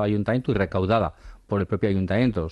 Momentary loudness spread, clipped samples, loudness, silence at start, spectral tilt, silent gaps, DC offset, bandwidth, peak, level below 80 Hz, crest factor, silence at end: 5 LU; under 0.1%; -24 LUFS; 0 s; -9 dB/octave; none; under 0.1%; 8 kHz; -8 dBFS; -44 dBFS; 14 dB; 0 s